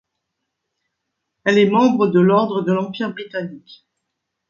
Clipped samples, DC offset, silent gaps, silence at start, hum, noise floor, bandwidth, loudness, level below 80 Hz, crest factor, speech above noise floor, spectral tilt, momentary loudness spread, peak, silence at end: under 0.1%; under 0.1%; none; 1.45 s; none; -78 dBFS; 7.4 kHz; -17 LUFS; -68 dBFS; 16 dB; 61 dB; -7 dB/octave; 14 LU; -2 dBFS; 0.9 s